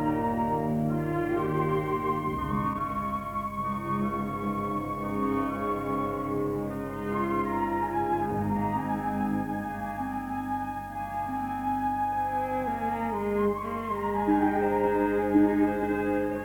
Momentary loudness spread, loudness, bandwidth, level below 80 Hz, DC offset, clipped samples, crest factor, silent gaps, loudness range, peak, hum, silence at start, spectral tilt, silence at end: 7 LU; -29 LUFS; 18 kHz; -48 dBFS; under 0.1%; under 0.1%; 16 dB; none; 5 LU; -12 dBFS; none; 0 s; -8 dB/octave; 0 s